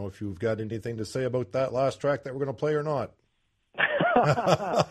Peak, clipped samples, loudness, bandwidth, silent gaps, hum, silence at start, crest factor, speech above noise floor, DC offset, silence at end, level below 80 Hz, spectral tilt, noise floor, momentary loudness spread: -8 dBFS; under 0.1%; -27 LUFS; 13 kHz; none; none; 0 s; 20 dB; 45 dB; under 0.1%; 0 s; -60 dBFS; -6 dB/octave; -72 dBFS; 11 LU